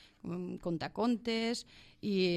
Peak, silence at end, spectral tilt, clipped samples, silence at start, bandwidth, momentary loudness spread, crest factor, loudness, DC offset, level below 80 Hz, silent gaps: -20 dBFS; 0 s; -5.5 dB/octave; under 0.1%; 0.25 s; 13 kHz; 10 LU; 16 dB; -36 LUFS; under 0.1%; -64 dBFS; none